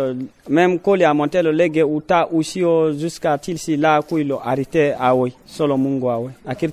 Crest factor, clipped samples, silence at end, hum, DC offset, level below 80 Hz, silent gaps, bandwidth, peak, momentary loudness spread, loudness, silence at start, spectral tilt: 16 dB; under 0.1%; 0 s; none; under 0.1%; -56 dBFS; none; 14.5 kHz; 0 dBFS; 7 LU; -18 LUFS; 0 s; -6.5 dB/octave